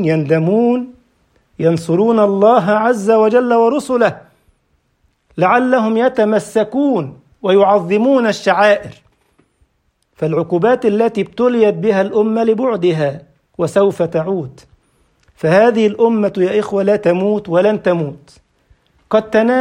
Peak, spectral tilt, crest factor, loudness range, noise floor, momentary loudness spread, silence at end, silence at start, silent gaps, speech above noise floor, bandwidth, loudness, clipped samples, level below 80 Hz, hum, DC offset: 0 dBFS; -7 dB/octave; 14 dB; 3 LU; -63 dBFS; 9 LU; 0 s; 0 s; none; 50 dB; 11 kHz; -14 LUFS; under 0.1%; -56 dBFS; none; under 0.1%